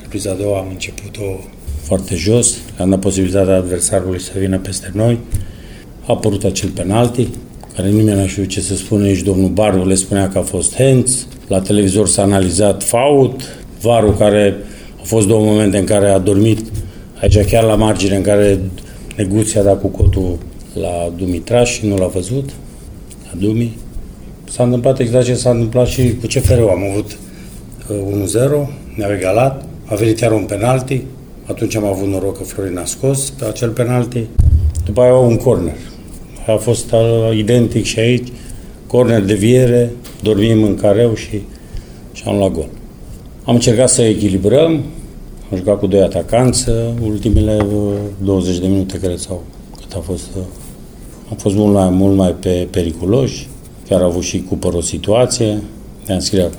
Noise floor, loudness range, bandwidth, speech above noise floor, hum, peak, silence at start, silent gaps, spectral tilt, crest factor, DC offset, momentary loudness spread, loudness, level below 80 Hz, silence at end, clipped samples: -33 dBFS; 5 LU; over 20 kHz; 20 dB; none; 0 dBFS; 0 s; none; -5.5 dB/octave; 14 dB; under 0.1%; 17 LU; -14 LUFS; -28 dBFS; 0 s; under 0.1%